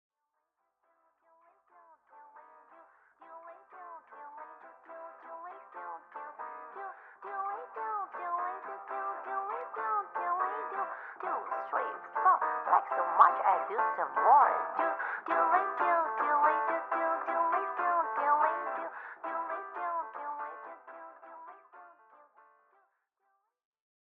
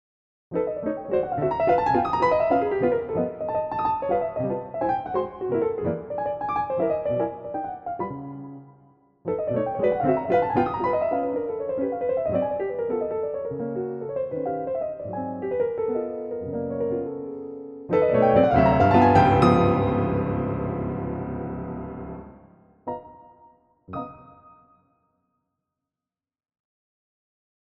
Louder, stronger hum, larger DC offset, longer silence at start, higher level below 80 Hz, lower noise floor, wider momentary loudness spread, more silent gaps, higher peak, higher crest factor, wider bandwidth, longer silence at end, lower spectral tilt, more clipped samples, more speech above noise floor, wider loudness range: second, -31 LUFS vs -24 LUFS; neither; neither; first, 2.15 s vs 0.5 s; second, under -90 dBFS vs -48 dBFS; second, -84 dBFS vs under -90 dBFS; first, 22 LU vs 17 LU; neither; second, -8 dBFS vs -4 dBFS; about the same, 24 dB vs 22 dB; second, 4.3 kHz vs 7.8 kHz; second, 2.15 s vs 3.35 s; second, -0.5 dB/octave vs -9 dB/octave; neither; second, 56 dB vs over 67 dB; first, 21 LU vs 18 LU